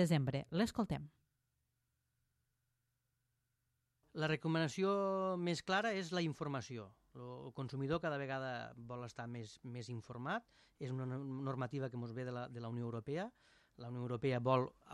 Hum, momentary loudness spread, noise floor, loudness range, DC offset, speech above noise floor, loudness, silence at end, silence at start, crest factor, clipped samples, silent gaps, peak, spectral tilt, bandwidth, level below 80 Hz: none; 13 LU; -85 dBFS; 7 LU; under 0.1%; 45 dB; -41 LUFS; 0 s; 0 s; 22 dB; under 0.1%; none; -20 dBFS; -6.5 dB/octave; 12.5 kHz; -72 dBFS